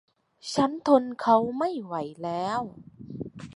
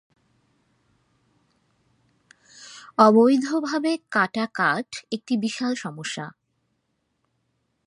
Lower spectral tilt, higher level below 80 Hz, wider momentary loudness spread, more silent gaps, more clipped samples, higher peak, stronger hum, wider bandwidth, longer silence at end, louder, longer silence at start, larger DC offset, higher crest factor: about the same, -5.5 dB/octave vs -5 dB/octave; first, -64 dBFS vs -76 dBFS; about the same, 17 LU vs 16 LU; neither; neither; second, -6 dBFS vs -2 dBFS; neither; about the same, 11.5 kHz vs 11.5 kHz; second, 0.05 s vs 1.55 s; second, -26 LUFS vs -22 LUFS; second, 0.45 s vs 2.6 s; neither; about the same, 22 dB vs 22 dB